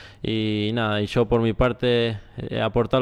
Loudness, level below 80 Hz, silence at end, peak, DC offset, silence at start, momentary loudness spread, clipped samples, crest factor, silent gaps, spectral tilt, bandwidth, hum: -23 LUFS; -40 dBFS; 0 s; -8 dBFS; under 0.1%; 0 s; 7 LU; under 0.1%; 14 dB; none; -7.5 dB/octave; 11 kHz; none